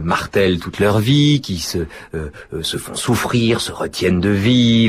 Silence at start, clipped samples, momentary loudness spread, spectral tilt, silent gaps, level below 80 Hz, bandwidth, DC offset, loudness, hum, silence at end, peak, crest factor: 0 s; under 0.1%; 13 LU; -5.5 dB/octave; none; -40 dBFS; 15.5 kHz; under 0.1%; -17 LUFS; none; 0 s; -4 dBFS; 14 dB